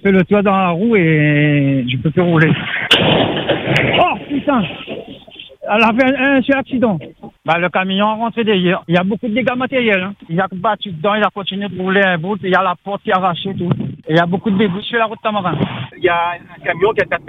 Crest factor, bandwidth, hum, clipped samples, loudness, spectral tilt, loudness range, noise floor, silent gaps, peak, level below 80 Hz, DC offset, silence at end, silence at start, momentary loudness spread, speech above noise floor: 16 dB; 10 kHz; none; under 0.1%; -15 LUFS; -7 dB/octave; 4 LU; -37 dBFS; none; 0 dBFS; -50 dBFS; under 0.1%; 0 s; 0.05 s; 9 LU; 22 dB